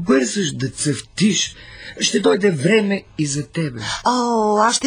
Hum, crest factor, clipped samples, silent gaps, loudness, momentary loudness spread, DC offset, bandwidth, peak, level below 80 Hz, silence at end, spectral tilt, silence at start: none; 16 dB; under 0.1%; none; -19 LUFS; 8 LU; under 0.1%; 16 kHz; -4 dBFS; -50 dBFS; 0 s; -4 dB/octave; 0 s